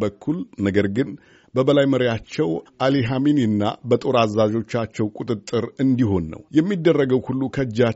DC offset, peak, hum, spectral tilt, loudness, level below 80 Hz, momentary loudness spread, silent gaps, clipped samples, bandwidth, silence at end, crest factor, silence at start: under 0.1%; -4 dBFS; none; -6 dB/octave; -21 LUFS; -52 dBFS; 8 LU; none; under 0.1%; 8 kHz; 0 s; 18 dB; 0 s